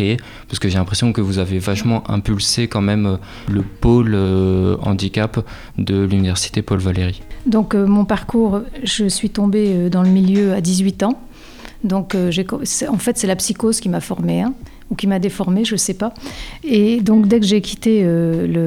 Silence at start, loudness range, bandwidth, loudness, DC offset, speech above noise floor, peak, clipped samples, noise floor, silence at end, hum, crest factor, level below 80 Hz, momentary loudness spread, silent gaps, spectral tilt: 0 s; 3 LU; 15.5 kHz; -17 LUFS; under 0.1%; 20 dB; -2 dBFS; under 0.1%; -36 dBFS; 0 s; none; 14 dB; -36 dBFS; 8 LU; none; -5.5 dB/octave